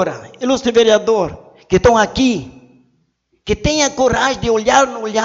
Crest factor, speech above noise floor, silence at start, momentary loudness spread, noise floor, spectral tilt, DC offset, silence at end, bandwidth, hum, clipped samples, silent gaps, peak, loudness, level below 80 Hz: 16 dB; 48 dB; 0 s; 10 LU; -63 dBFS; -4 dB/octave; under 0.1%; 0 s; 8 kHz; none; under 0.1%; none; 0 dBFS; -15 LUFS; -36 dBFS